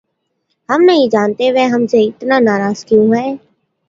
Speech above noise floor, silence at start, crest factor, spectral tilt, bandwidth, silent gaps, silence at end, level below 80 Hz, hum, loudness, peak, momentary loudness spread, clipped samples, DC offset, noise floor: 56 dB; 0.7 s; 14 dB; -6 dB/octave; 7.6 kHz; none; 0.5 s; -60 dBFS; none; -12 LUFS; 0 dBFS; 7 LU; under 0.1%; under 0.1%; -68 dBFS